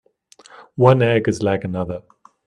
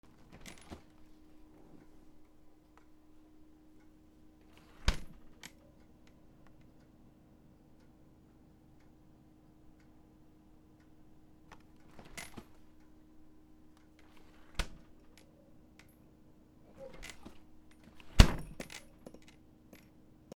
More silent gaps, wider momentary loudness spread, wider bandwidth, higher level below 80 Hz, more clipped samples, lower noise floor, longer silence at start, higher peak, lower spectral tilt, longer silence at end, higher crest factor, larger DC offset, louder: neither; second, 17 LU vs 20 LU; second, 10.5 kHz vs 18.5 kHz; second, -54 dBFS vs -44 dBFS; neither; second, -50 dBFS vs -61 dBFS; first, 0.6 s vs 0.45 s; about the same, 0 dBFS vs 0 dBFS; first, -7 dB/octave vs -4.5 dB/octave; second, 0.45 s vs 1.6 s; second, 20 dB vs 40 dB; neither; first, -18 LUFS vs -36 LUFS